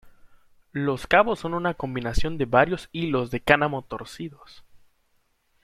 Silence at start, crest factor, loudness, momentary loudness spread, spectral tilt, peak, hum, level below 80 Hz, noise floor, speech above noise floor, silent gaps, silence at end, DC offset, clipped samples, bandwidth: 0.05 s; 24 dB; -24 LUFS; 16 LU; -6 dB/octave; -2 dBFS; none; -40 dBFS; -68 dBFS; 44 dB; none; 1 s; under 0.1%; under 0.1%; 15 kHz